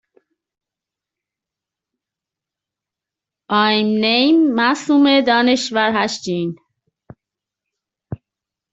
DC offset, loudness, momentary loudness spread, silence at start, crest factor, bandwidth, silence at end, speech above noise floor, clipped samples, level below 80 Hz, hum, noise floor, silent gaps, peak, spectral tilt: under 0.1%; -16 LUFS; 17 LU; 3.5 s; 18 dB; 8 kHz; 0.6 s; 71 dB; under 0.1%; -62 dBFS; none; -86 dBFS; none; -2 dBFS; -4.5 dB/octave